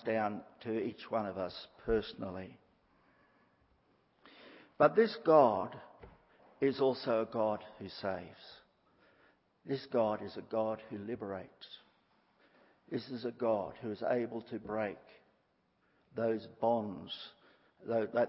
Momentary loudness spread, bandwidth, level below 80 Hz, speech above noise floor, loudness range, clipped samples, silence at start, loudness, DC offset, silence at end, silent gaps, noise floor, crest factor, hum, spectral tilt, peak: 22 LU; 5.6 kHz; -66 dBFS; 41 dB; 9 LU; under 0.1%; 0.05 s; -35 LUFS; under 0.1%; 0 s; none; -75 dBFS; 24 dB; none; -4.5 dB/octave; -12 dBFS